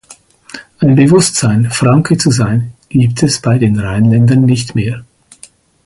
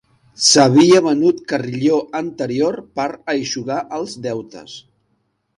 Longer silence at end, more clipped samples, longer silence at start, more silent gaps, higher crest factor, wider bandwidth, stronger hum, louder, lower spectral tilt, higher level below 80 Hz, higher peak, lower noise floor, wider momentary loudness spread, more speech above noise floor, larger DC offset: about the same, 0.85 s vs 0.8 s; neither; second, 0.1 s vs 0.4 s; neither; second, 12 dB vs 18 dB; about the same, 11.5 kHz vs 11.5 kHz; neither; first, -11 LUFS vs -16 LUFS; first, -6 dB/octave vs -4 dB/octave; first, -40 dBFS vs -60 dBFS; about the same, 0 dBFS vs 0 dBFS; second, -42 dBFS vs -67 dBFS; second, 10 LU vs 16 LU; second, 32 dB vs 50 dB; neither